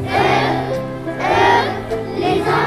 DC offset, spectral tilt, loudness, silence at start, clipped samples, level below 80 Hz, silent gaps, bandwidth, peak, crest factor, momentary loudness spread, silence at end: under 0.1%; -5.5 dB/octave; -17 LUFS; 0 s; under 0.1%; -42 dBFS; none; 15 kHz; -2 dBFS; 14 dB; 10 LU; 0 s